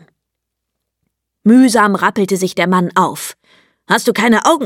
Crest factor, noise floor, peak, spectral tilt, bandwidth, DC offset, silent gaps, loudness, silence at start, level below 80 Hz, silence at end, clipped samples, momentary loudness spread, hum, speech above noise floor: 14 dB; -77 dBFS; 0 dBFS; -4.5 dB/octave; 16.5 kHz; under 0.1%; none; -13 LUFS; 1.45 s; -60 dBFS; 0 s; under 0.1%; 9 LU; none; 64 dB